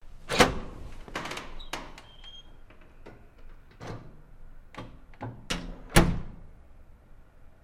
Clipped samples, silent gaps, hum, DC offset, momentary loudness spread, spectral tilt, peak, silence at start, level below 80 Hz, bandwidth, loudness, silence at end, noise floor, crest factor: under 0.1%; none; none; under 0.1%; 26 LU; -4 dB/octave; -2 dBFS; 0 s; -40 dBFS; 16 kHz; -29 LUFS; 0.1 s; -51 dBFS; 30 dB